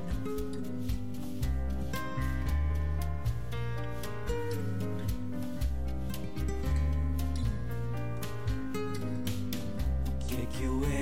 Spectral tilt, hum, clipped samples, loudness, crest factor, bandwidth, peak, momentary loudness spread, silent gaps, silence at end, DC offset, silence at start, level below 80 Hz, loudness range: -6.5 dB/octave; none; under 0.1%; -35 LUFS; 14 dB; 16.5 kHz; -18 dBFS; 5 LU; none; 0 s; 2%; 0 s; -36 dBFS; 1 LU